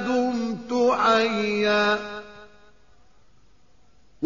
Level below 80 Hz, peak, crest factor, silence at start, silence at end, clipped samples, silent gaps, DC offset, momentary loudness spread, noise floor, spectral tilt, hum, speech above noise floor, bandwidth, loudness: -60 dBFS; -10 dBFS; 16 dB; 0 s; 0 s; under 0.1%; none; 0.3%; 9 LU; -60 dBFS; -2.5 dB/octave; none; 39 dB; 7.2 kHz; -22 LUFS